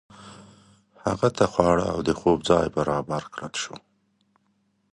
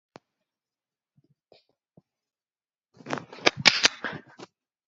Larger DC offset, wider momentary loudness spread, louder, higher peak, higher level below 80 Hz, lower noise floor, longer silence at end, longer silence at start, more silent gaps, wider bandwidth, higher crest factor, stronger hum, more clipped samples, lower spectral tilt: neither; second, 12 LU vs 18 LU; about the same, -24 LUFS vs -23 LUFS; about the same, -2 dBFS vs 0 dBFS; first, -48 dBFS vs -70 dBFS; second, -69 dBFS vs under -90 dBFS; first, 1.15 s vs 0.4 s; second, 0.2 s vs 3.05 s; neither; first, 11.5 kHz vs 7.6 kHz; second, 24 dB vs 32 dB; neither; neither; first, -5.5 dB/octave vs 0 dB/octave